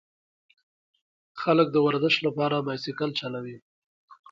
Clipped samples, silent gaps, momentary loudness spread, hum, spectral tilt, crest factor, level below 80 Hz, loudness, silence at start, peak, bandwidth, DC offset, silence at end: under 0.1%; 3.62-4.08 s; 14 LU; none; -6.5 dB/octave; 20 dB; -74 dBFS; -25 LUFS; 1.35 s; -8 dBFS; 7.6 kHz; under 0.1%; 0.2 s